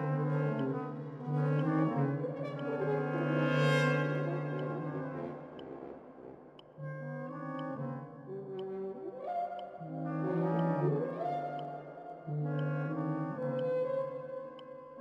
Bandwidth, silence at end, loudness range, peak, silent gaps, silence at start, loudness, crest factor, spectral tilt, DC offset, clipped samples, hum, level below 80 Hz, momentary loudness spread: 8 kHz; 0 s; 10 LU; -16 dBFS; none; 0 s; -35 LUFS; 18 dB; -8 dB/octave; under 0.1%; under 0.1%; none; -78 dBFS; 15 LU